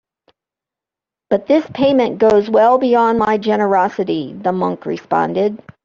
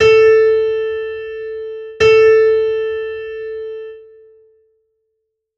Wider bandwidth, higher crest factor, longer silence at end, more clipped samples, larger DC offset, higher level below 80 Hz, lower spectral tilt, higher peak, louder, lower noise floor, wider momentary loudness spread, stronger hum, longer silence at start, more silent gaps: about the same, 7.4 kHz vs 7.2 kHz; about the same, 14 dB vs 14 dB; second, 0.25 s vs 1.55 s; neither; neither; second, -54 dBFS vs -48 dBFS; first, -7 dB/octave vs -4 dB/octave; about the same, -2 dBFS vs -2 dBFS; about the same, -15 LUFS vs -14 LUFS; first, -87 dBFS vs -72 dBFS; second, 8 LU vs 18 LU; neither; first, 1.3 s vs 0 s; neither